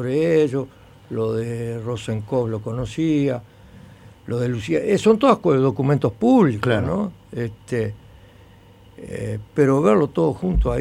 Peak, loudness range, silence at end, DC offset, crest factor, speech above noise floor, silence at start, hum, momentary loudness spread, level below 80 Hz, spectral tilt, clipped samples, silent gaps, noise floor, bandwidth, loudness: -2 dBFS; 6 LU; 0 s; under 0.1%; 20 dB; 28 dB; 0 s; none; 13 LU; -36 dBFS; -7.5 dB/octave; under 0.1%; none; -48 dBFS; 13 kHz; -21 LUFS